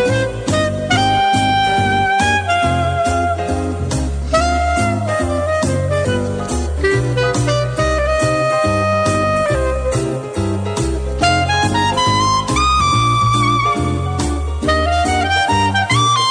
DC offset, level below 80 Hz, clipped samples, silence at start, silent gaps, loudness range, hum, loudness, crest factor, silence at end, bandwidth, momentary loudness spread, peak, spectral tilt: under 0.1%; -26 dBFS; under 0.1%; 0 s; none; 3 LU; none; -16 LUFS; 14 dB; 0 s; 10 kHz; 6 LU; -2 dBFS; -4.5 dB/octave